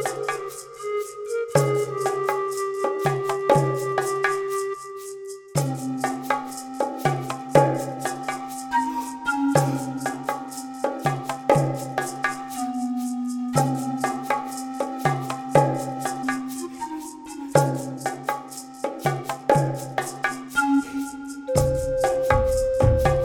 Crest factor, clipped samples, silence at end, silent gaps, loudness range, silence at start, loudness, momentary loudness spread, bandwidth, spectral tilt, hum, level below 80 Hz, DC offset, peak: 22 dB; under 0.1%; 0 s; none; 3 LU; 0 s; -25 LUFS; 11 LU; 18.5 kHz; -5.5 dB/octave; none; -42 dBFS; under 0.1%; -2 dBFS